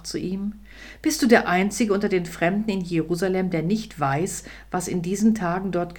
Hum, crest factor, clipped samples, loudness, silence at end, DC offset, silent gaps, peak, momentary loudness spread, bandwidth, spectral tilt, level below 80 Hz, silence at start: none; 20 dB; under 0.1%; -23 LUFS; 0 s; under 0.1%; none; -2 dBFS; 12 LU; 19 kHz; -5.5 dB/octave; -48 dBFS; 0 s